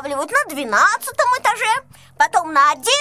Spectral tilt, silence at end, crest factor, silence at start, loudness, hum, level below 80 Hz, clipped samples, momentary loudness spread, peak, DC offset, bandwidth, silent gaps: -0.5 dB/octave; 0 s; 16 dB; 0 s; -17 LUFS; none; -60 dBFS; under 0.1%; 5 LU; -2 dBFS; under 0.1%; 16 kHz; none